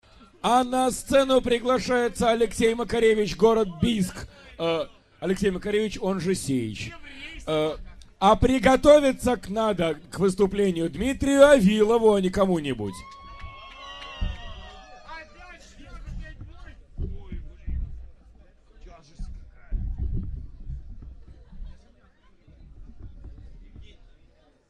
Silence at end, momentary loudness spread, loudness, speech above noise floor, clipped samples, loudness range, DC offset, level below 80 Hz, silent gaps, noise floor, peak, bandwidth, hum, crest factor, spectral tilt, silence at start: 0.85 s; 23 LU; -23 LUFS; 36 dB; under 0.1%; 19 LU; under 0.1%; -40 dBFS; none; -58 dBFS; -2 dBFS; 13 kHz; none; 22 dB; -5.5 dB/octave; 0.45 s